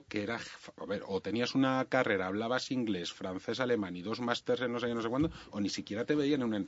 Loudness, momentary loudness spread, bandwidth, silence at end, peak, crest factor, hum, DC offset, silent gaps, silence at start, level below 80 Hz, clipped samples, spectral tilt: -34 LUFS; 9 LU; 8 kHz; 0 s; -12 dBFS; 20 dB; none; under 0.1%; none; 0.1 s; -62 dBFS; under 0.1%; -5.5 dB/octave